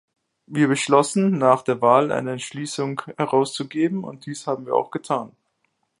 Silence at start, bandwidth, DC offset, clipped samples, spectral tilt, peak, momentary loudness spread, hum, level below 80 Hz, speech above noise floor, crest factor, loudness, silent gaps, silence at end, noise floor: 0.5 s; 11.5 kHz; under 0.1%; under 0.1%; -5.5 dB/octave; -2 dBFS; 12 LU; none; -70 dBFS; 50 dB; 20 dB; -22 LUFS; none; 0.7 s; -72 dBFS